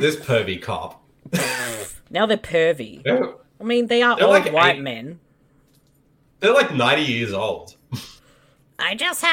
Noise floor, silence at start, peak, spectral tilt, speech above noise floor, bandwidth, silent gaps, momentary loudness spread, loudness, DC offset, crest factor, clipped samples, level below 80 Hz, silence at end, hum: -59 dBFS; 0 s; -4 dBFS; -4 dB/octave; 40 dB; 17.5 kHz; none; 18 LU; -20 LUFS; under 0.1%; 18 dB; under 0.1%; -58 dBFS; 0 s; none